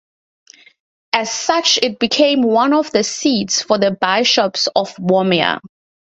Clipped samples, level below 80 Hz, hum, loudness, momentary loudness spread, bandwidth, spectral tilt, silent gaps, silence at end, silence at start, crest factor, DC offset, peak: under 0.1%; -60 dBFS; none; -15 LUFS; 5 LU; 8.2 kHz; -3 dB/octave; none; 0.45 s; 1.15 s; 16 dB; under 0.1%; 0 dBFS